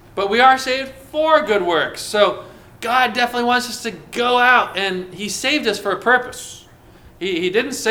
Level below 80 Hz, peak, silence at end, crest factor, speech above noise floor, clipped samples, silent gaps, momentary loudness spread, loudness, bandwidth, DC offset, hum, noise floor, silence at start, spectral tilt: -52 dBFS; 0 dBFS; 0 s; 18 dB; 27 dB; under 0.1%; none; 13 LU; -17 LUFS; 19.5 kHz; under 0.1%; none; -45 dBFS; 0.15 s; -2.5 dB/octave